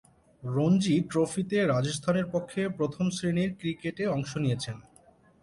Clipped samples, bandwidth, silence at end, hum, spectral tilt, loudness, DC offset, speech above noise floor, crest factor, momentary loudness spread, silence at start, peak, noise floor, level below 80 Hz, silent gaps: under 0.1%; 11.5 kHz; 0.6 s; none; -6 dB/octave; -29 LUFS; under 0.1%; 32 dB; 16 dB; 8 LU; 0.4 s; -14 dBFS; -59 dBFS; -60 dBFS; none